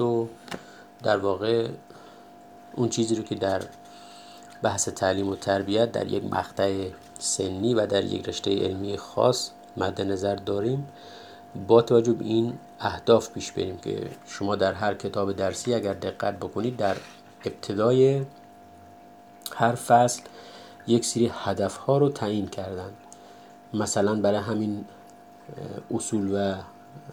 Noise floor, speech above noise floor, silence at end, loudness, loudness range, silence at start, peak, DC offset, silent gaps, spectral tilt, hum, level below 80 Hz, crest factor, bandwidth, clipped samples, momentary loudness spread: -49 dBFS; 24 dB; 0 s; -26 LUFS; 4 LU; 0 s; -6 dBFS; under 0.1%; none; -5 dB/octave; none; -64 dBFS; 22 dB; 20 kHz; under 0.1%; 18 LU